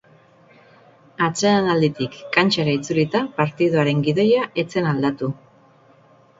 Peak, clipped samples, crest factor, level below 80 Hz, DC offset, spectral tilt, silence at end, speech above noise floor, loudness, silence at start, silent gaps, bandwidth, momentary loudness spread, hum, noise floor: 0 dBFS; under 0.1%; 20 dB; -58 dBFS; under 0.1%; -5.5 dB/octave; 1.05 s; 33 dB; -20 LUFS; 1.2 s; none; 7.8 kHz; 6 LU; none; -52 dBFS